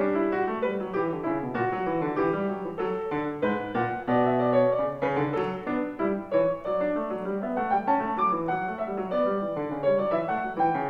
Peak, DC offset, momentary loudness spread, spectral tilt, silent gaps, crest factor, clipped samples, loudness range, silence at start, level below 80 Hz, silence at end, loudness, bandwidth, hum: -12 dBFS; under 0.1%; 6 LU; -9 dB/octave; none; 16 dB; under 0.1%; 2 LU; 0 s; -58 dBFS; 0 s; -27 LUFS; 5.8 kHz; none